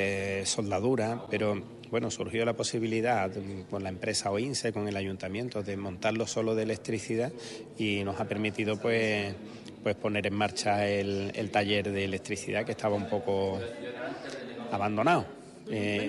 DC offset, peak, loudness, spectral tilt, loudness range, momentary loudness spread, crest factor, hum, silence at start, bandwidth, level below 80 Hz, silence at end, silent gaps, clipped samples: under 0.1%; -14 dBFS; -31 LUFS; -4.5 dB/octave; 2 LU; 10 LU; 18 dB; none; 0 s; 12 kHz; -58 dBFS; 0 s; none; under 0.1%